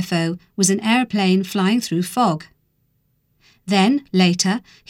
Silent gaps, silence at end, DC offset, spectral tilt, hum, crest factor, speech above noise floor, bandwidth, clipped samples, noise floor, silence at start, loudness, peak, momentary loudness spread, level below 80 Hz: none; 0.3 s; under 0.1%; -4.5 dB/octave; none; 16 dB; 47 dB; 16.5 kHz; under 0.1%; -65 dBFS; 0 s; -18 LUFS; -2 dBFS; 6 LU; -64 dBFS